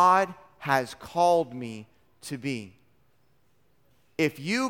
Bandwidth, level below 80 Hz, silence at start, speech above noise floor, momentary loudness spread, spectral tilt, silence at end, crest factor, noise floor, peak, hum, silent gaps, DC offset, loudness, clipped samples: 17.5 kHz; -68 dBFS; 0 s; 43 dB; 17 LU; -5 dB/octave; 0 s; 20 dB; -69 dBFS; -8 dBFS; none; none; under 0.1%; -27 LUFS; under 0.1%